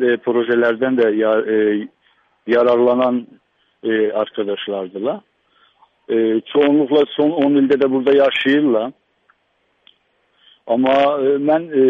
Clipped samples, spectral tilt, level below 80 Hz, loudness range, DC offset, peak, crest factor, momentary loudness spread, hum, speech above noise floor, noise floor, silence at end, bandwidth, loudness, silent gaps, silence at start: under 0.1%; -7.5 dB/octave; -64 dBFS; 5 LU; under 0.1%; -4 dBFS; 14 dB; 10 LU; none; 49 dB; -64 dBFS; 0 s; 5.4 kHz; -16 LUFS; none; 0 s